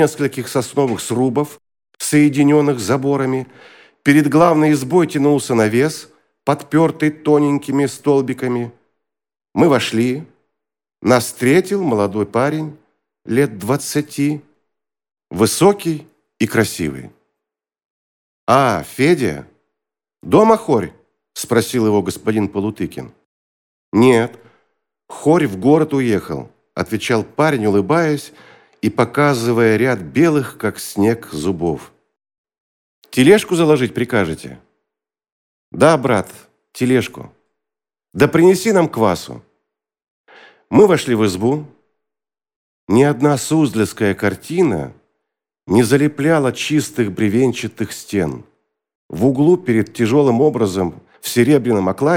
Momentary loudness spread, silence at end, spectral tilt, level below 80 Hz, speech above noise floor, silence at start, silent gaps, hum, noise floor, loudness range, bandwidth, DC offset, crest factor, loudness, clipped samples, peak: 12 LU; 0 s; -6 dB/octave; -54 dBFS; 71 dB; 0 s; 17.85-18.47 s, 23.25-23.92 s, 32.38-32.44 s, 32.60-33.02 s, 35.32-35.72 s, 40.10-40.24 s, 42.56-42.87 s, 48.95-49.09 s; none; -86 dBFS; 4 LU; 18 kHz; under 0.1%; 16 dB; -16 LUFS; under 0.1%; 0 dBFS